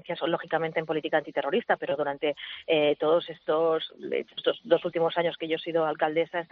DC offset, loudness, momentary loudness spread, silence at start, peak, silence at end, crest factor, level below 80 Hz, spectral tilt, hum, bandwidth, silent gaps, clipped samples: under 0.1%; -28 LUFS; 6 LU; 0.05 s; -8 dBFS; 0.05 s; 18 dB; -76 dBFS; -2.5 dB/octave; none; 4.8 kHz; none; under 0.1%